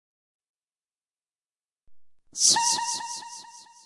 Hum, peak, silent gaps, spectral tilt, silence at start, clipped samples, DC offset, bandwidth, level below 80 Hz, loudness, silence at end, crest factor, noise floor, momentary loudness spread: none; -6 dBFS; none; 2 dB/octave; 1.9 s; under 0.1%; under 0.1%; 11.5 kHz; -74 dBFS; -22 LUFS; 0.25 s; 24 dB; under -90 dBFS; 22 LU